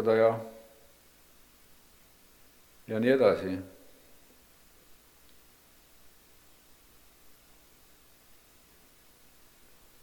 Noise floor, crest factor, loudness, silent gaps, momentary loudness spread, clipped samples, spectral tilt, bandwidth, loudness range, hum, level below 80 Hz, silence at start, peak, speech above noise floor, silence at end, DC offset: -59 dBFS; 24 dB; -27 LUFS; none; 27 LU; under 0.1%; -6.5 dB/octave; 19 kHz; 5 LU; 60 Hz at -65 dBFS; -68 dBFS; 0 s; -10 dBFS; 33 dB; 6.35 s; under 0.1%